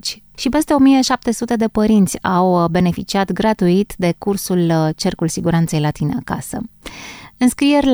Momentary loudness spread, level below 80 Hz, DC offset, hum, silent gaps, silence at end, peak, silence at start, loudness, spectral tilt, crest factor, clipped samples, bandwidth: 12 LU; -42 dBFS; under 0.1%; none; none; 0 s; -2 dBFS; 0.05 s; -16 LUFS; -5.5 dB/octave; 14 dB; under 0.1%; over 20 kHz